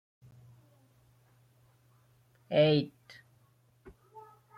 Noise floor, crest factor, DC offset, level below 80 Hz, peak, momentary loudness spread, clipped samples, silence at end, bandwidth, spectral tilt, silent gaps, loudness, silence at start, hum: -67 dBFS; 22 dB; under 0.1%; -72 dBFS; -14 dBFS; 29 LU; under 0.1%; 0.4 s; 6.6 kHz; -8 dB/octave; none; -28 LUFS; 2.5 s; none